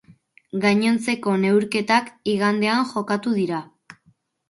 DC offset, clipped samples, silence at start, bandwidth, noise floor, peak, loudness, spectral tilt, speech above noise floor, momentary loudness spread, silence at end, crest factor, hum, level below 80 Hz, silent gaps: under 0.1%; under 0.1%; 0.55 s; 11.5 kHz; -62 dBFS; -4 dBFS; -21 LUFS; -5.5 dB/octave; 41 dB; 6 LU; 0.55 s; 18 dB; none; -66 dBFS; none